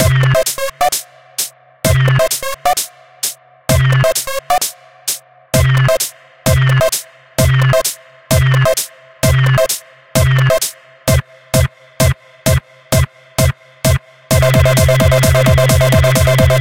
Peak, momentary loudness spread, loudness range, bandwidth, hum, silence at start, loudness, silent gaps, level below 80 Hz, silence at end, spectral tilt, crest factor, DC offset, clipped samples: 0 dBFS; 10 LU; 4 LU; 17.5 kHz; none; 0 s; -14 LUFS; none; -26 dBFS; 0 s; -4.5 dB/octave; 14 dB; 0.6%; under 0.1%